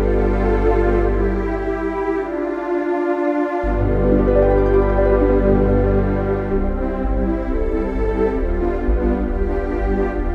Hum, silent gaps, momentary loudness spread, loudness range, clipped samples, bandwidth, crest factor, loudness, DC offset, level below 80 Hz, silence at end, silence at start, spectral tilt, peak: none; none; 6 LU; 4 LU; under 0.1%; 4.8 kHz; 14 dB; -19 LUFS; under 0.1%; -22 dBFS; 0 s; 0 s; -10 dB/octave; -4 dBFS